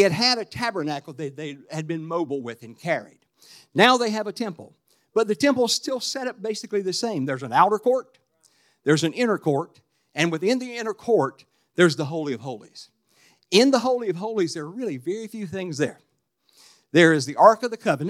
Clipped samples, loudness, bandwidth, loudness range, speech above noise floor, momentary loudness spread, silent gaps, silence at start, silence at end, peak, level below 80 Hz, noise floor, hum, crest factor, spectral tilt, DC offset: under 0.1%; -23 LUFS; 15.5 kHz; 3 LU; 45 dB; 15 LU; none; 0 s; 0 s; 0 dBFS; -72 dBFS; -68 dBFS; none; 24 dB; -4.5 dB/octave; under 0.1%